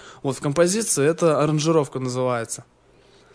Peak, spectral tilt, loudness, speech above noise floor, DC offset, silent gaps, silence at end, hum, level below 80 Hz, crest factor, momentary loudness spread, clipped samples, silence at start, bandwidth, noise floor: -4 dBFS; -5 dB/octave; -21 LUFS; 33 dB; under 0.1%; none; 0.7 s; none; -60 dBFS; 18 dB; 9 LU; under 0.1%; 0 s; 11 kHz; -54 dBFS